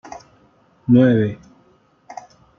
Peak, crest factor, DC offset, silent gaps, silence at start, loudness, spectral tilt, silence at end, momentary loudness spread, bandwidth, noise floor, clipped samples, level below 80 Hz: -2 dBFS; 18 dB; under 0.1%; none; 0.05 s; -16 LUFS; -9 dB/octave; 0.45 s; 26 LU; 6.8 kHz; -56 dBFS; under 0.1%; -58 dBFS